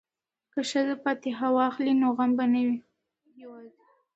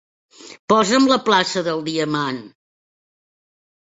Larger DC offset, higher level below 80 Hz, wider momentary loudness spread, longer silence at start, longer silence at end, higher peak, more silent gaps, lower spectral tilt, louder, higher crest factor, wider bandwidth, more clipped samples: neither; second, -80 dBFS vs -64 dBFS; about the same, 11 LU vs 11 LU; first, 0.55 s vs 0.4 s; second, 0.5 s vs 1.5 s; second, -12 dBFS vs -2 dBFS; second, none vs 0.59-0.68 s; about the same, -4.5 dB/octave vs -4 dB/octave; second, -27 LUFS vs -18 LUFS; about the same, 16 dB vs 20 dB; about the same, 8.2 kHz vs 8 kHz; neither